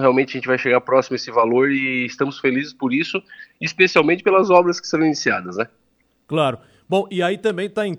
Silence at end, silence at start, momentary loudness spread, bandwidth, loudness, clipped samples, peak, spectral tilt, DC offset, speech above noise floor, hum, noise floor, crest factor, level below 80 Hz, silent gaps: 0 s; 0 s; 11 LU; 11 kHz; -19 LUFS; under 0.1%; 0 dBFS; -5 dB/octave; under 0.1%; 40 dB; none; -59 dBFS; 18 dB; -66 dBFS; none